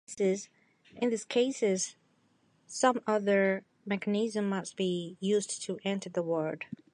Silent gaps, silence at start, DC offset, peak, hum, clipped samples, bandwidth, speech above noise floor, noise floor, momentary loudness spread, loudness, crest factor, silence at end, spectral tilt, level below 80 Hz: none; 0.1 s; under 0.1%; -10 dBFS; none; under 0.1%; 11.5 kHz; 39 dB; -69 dBFS; 9 LU; -31 LUFS; 20 dB; 0.2 s; -4.5 dB/octave; -80 dBFS